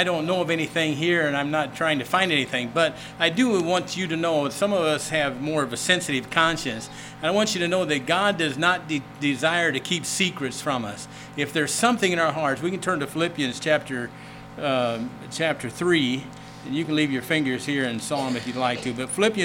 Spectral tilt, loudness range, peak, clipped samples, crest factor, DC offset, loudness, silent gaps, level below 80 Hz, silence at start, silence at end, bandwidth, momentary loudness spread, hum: -4 dB/octave; 3 LU; -2 dBFS; under 0.1%; 22 dB; under 0.1%; -24 LUFS; none; -58 dBFS; 0 s; 0 s; 18.5 kHz; 9 LU; none